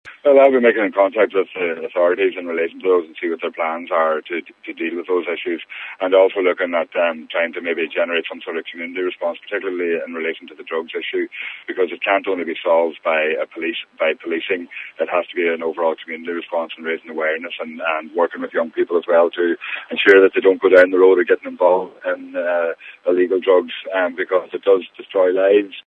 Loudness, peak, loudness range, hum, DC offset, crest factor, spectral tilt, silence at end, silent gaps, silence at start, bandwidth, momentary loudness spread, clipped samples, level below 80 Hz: -18 LUFS; 0 dBFS; 8 LU; none; under 0.1%; 18 dB; -5.5 dB/octave; 0.05 s; none; 0.05 s; 5.2 kHz; 13 LU; under 0.1%; -72 dBFS